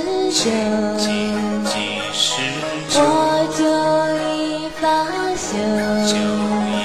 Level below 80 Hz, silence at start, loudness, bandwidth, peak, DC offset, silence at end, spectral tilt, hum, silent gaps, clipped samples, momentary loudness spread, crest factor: -52 dBFS; 0 s; -18 LUFS; 14.5 kHz; -4 dBFS; 0.6%; 0 s; -3.5 dB/octave; none; none; under 0.1%; 5 LU; 16 dB